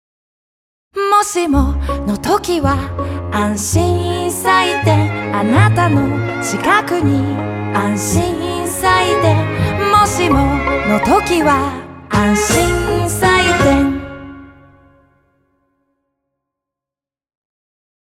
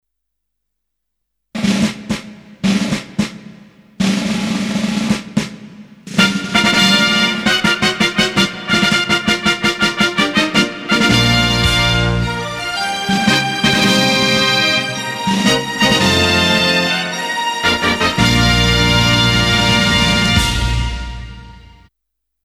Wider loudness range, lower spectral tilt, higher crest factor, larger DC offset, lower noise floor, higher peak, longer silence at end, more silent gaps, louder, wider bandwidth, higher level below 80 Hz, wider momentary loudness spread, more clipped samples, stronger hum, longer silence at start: second, 3 LU vs 7 LU; about the same, -5 dB/octave vs -4 dB/octave; about the same, 16 dB vs 16 dB; neither; first, -89 dBFS vs -76 dBFS; about the same, 0 dBFS vs 0 dBFS; first, 3.5 s vs 0.85 s; neither; about the same, -14 LUFS vs -14 LUFS; about the same, 16 kHz vs 16 kHz; about the same, -30 dBFS vs -30 dBFS; about the same, 8 LU vs 9 LU; neither; neither; second, 0.95 s vs 1.55 s